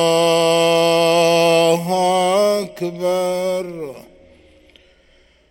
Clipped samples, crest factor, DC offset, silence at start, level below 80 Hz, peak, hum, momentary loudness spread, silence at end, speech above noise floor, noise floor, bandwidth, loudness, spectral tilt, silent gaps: under 0.1%; 16 dB; under 0.1%; 0 s; -58 dBFS; -2 dBFS; none; 11 LU; 1.5 s; 35 dB; -54 dBFS; 17 kHz; -16 LUFS; -4 dB/octave; none